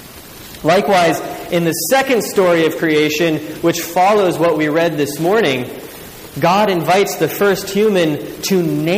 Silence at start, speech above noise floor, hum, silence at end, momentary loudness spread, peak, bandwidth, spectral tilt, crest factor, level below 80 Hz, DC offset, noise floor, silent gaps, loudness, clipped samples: 0 s; 21 dB; none; 0 s; 9 LU; -4 dBFS; 15.5 kHz; -4.5 dB/octave; 12 dB; -50 dBFS; under 0.1%; -35 dBFS; none; -15 LUFS; under 0.1%